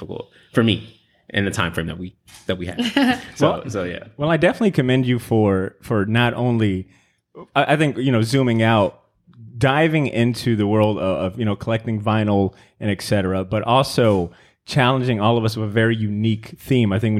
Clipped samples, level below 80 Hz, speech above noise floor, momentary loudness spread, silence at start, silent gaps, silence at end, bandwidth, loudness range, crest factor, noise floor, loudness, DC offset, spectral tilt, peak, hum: under 0.1%; -50 dBFS; 26 dB; 9 LU; 0 s; none; 0 s; 15 kHz; 3 LU; 18 dB; -45 dBFS; -20 LUFS; under 0.1%; -6.5 dB/octave; -2 dBFS; none